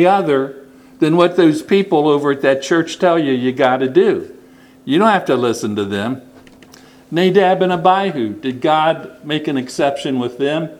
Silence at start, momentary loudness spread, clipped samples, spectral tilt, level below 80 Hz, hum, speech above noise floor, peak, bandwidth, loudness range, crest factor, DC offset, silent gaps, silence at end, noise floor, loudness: 0 s; 9 LU; under 0.1%; -6 dB/octave; -62 dBFS; none; 29 dB; 0 dBFS; 14 kHz; 3 LU; 16 dB; under 0.1%; none; 0 s; -44 dBFS; -15 LUFS